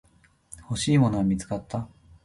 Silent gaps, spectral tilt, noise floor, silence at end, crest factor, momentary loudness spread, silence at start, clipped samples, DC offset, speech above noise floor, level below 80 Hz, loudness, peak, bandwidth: none; -6 dB/octave; -51 dBFS; 0.35 s; 16 dB; 23 LU; 0.6 s; under 0.1%; under 0.1%; 27 dB; -50 dBFS; -26 LUFS; -10 dBFS; 11.5 kHz